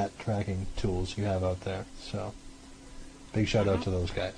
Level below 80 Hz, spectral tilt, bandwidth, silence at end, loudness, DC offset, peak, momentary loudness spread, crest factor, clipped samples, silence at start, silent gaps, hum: -44 dBFS; -6.5 dB/octave; 10.5 kHz; 0 s; -32 LUFS; under 0.1%; -14 dBFS; 23 LU; 16 dB; under 0.1%; 0 s; none; none